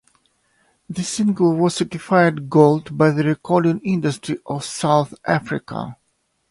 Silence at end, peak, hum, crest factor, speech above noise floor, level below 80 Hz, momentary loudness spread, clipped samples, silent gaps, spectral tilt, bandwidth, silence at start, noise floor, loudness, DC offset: 0.55 s; 0 dBFS; none; 20 dB; 50 dB; -58 dBFS; 12 LU; under 0.1%; none; -6 dB/octave; 11.5 kHz; 0.9 s; -68 dBFS; -19 LUFS; under 0.1%